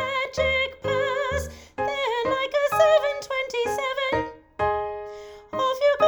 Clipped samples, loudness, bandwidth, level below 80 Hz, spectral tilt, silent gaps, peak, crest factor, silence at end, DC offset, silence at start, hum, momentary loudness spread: under 0.1%; -24 LUFS; over 20 kHz; -46 dBFS; -3.5 dB/octave; none; -6 dBFS; 18 dB; 0 s; under 0.1%; 0 s; none; 13 LU